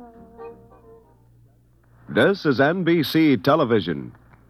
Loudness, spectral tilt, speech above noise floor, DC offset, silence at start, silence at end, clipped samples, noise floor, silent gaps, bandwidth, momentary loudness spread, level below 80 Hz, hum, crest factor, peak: -20 LUFS; -7 dB/octave; 35 dB; under 0.1%; 0 s; 0.4 s; under 0.1%; -56 dBFS; none; 15 kHz; 23 LU; -58 dBFS; none; 18 dB; -6 dBFS